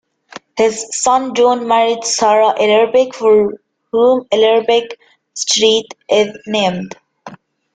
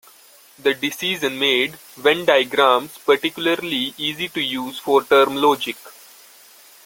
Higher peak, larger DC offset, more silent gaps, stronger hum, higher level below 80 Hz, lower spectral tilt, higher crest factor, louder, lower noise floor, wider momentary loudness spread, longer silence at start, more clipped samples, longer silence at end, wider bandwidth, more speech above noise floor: about the same, -2 dBFS vs 0 dBFS; neither; neither; neither; first, -58 dBFS vs -64 dBFS; about the same, -2.5 dB/octave vs -3 dB/octave; second, 14 dB vs 20 dB; first, -13 LUFS vs -19 LUFS; second, -38 dBFS vs -49 dBFS; about the same, 9 LU vs 8 LU; second, 0.35 s vs 0.65 s; neither; second, 0.4 s vs 0.95 s; second, 9.4 kHz vs 17 kHz; second, 25 dB vs 29 dB